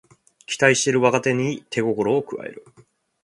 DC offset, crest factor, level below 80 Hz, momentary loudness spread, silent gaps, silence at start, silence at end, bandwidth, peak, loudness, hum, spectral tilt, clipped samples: under 0.1%; 22 dB; -64 dBFS; 15 LU; none; 0.5 s; 0.65 s; 11.5 kHz; 0 dBFS; -20 LUFS; none; -4 dB/octave; under 0.1%